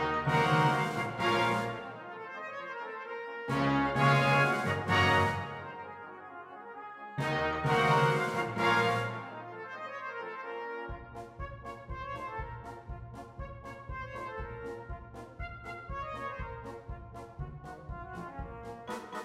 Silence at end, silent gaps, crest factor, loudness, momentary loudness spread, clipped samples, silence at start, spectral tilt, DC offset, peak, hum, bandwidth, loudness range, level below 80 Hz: 0 s; none; 20 dB; -31 LUFS; 19 LU; under 0.1%; 0 s; -6 dB/octave; under 0.1%; -14 dBFS; none; 15 kHz; 14 LU; -52 dBFS